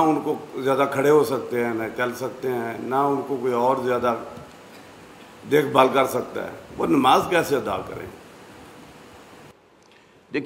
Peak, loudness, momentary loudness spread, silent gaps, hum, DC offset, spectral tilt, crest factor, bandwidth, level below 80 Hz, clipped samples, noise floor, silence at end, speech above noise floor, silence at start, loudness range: -4 dBFS; -22 LUFS; 16 LU; none; none; under 0.1%; -5.5 dB/octave; 20 dB; 16 kHz; -60 dBFS; under 0.1%; -53 dBFS; 0 s; 32 dB; 0 s; 4 LU